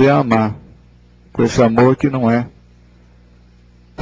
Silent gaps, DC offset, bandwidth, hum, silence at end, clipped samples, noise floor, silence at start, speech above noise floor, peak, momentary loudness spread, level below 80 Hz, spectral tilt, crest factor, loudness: none; under 0.1%; 7.8 kHz; 60 Hz at -35 dBFS; 0 s; under 0.1%; -47 dBFS; 0 s; 34 dB; 0 dBFS; 17 LU; -44 dBFS; -7.5 dB/octave; 16 dB; -15 LUFS